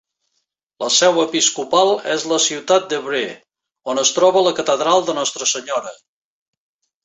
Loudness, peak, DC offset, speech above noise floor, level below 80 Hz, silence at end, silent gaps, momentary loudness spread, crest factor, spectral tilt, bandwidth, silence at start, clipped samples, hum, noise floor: -17 LUFS; -2 dBFS; under 0.1%; 55 dB; -68 dBFS; 1.1 s; none; 11 LU; 18 dB; -1.5 dB/octave; 8.4 kHz; 0.8 s; under 0.1%; none; -72 dBFS